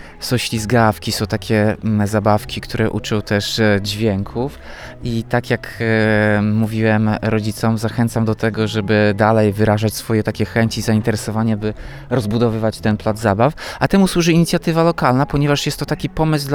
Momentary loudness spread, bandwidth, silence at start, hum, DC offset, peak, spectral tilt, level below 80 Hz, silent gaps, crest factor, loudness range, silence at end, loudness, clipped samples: 7 LU; 19.5 kHz; 0 s; none; under 0.1%; 0 dBFS; -6 dB/octave; -38 dBFS; none; 16 dB; 3 LU; 0 s; -17 LUFS; under 0.1%